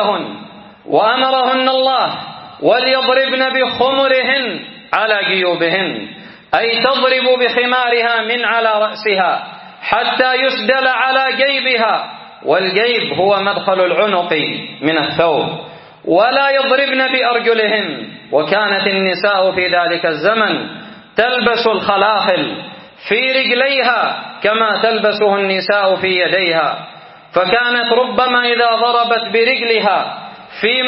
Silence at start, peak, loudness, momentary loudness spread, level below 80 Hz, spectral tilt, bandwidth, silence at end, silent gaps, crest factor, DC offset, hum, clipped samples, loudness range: 0 s; 0 dBFS; -14 LUFS; 9 LU; -58 dBFS; -0.5 dB/octave; 5.8 kHz; 0 s; none; 14 dB; under 0.1%; none; under 0.1%; 1 LU